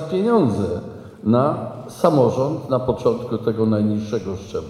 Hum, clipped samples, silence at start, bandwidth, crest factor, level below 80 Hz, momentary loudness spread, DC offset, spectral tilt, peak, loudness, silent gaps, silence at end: none; under 0.1%; 0 s; 13.5 kHz; 18 dB; -50 dBFS; 11 LU; under 0.1%; -8 dB/octave; -2 dBFS; -20 LUFS; none; 0 s